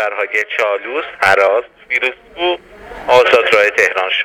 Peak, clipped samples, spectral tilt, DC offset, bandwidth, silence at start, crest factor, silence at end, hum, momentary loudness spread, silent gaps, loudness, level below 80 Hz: 0 dBFS; under 0.1%; -2.5 dB/octave; under 0.1%; 16.5 kHz; 0 s; 14 dB; 0 s; none; 10 LU; none; -13 LUFS; -50 dBFS